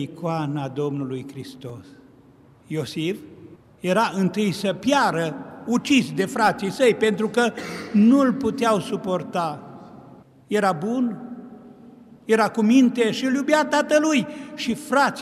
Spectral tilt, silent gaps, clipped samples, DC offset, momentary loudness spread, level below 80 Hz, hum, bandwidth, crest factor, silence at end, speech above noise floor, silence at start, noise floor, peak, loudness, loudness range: -5.5 dB/octave; none; under 0.1%; under 0.1%; 17 LU; -64 dBFS; none; 14.5 kHz; 16 dB; 0 s; 30 dB; 0 s; -52 dBFS; -6 dBFS; -22 LUFS; 8 LU